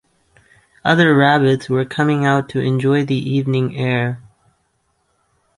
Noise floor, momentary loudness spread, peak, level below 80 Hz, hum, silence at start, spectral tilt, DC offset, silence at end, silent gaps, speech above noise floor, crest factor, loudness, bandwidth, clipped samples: -65 dBFS; 8 LU; -2 dBFS; -56 dBFS; none; 0.85 s; -7 dB/octave; under 0.1%; 1.4 s; none; 50 dB; 16 dB; -16 LUFS; 11.5 kHz; under 0.1%